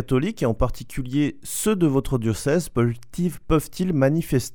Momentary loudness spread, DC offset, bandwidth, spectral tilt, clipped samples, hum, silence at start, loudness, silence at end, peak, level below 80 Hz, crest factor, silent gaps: 7 LU; 0.9%; over 20 kHz; -6.5 dB/octave; under 0.1%; none; 0 s; -23 LUFS; 0.05 s; -6 dBFS; -36 dBFS; 16 dB; none